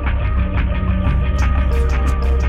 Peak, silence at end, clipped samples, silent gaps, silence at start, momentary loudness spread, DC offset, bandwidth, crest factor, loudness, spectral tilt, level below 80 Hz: -6 dBFS; 0 s; under 0.1%; none; 0 s; 2 LU; under 0.1%; 7.4 kHz; 10 dB; -18 LUFS; -7.5 dB/octave; -16 dBFS